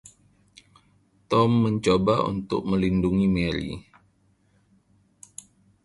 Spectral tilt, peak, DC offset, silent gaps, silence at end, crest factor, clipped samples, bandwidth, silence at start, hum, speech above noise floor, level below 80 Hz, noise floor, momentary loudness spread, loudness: -7 dB/octave; -6 dBFS; under 0.1%; none; 2.05 s; 18 dB; under 0.1%; 11.5 kHz; 1.3 s; none; 42 dB; -46 dBFS; -64 dBFS; 22 LU; -23 LUFS